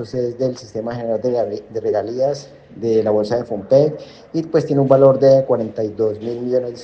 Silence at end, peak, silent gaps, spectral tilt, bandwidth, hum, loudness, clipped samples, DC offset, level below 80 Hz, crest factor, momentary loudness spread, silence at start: 0 s; 0 dBFS; none; -8 dB/octave; 7.6 kHz; none; -18 LUFS; under 0.1%; under 0.1%; -58 dBFS; 18 dB; 13 LU; 0 s